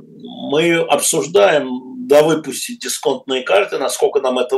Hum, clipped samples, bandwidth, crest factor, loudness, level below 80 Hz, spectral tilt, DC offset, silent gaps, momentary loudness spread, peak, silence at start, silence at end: none; under 0.1%; 16 kHz; 16 dB; -16 LUFS; -70 dBFS; -3 dB/octave; under 0.1%; none; 11 LU; 0 dBFS; 0.15 s; 0 s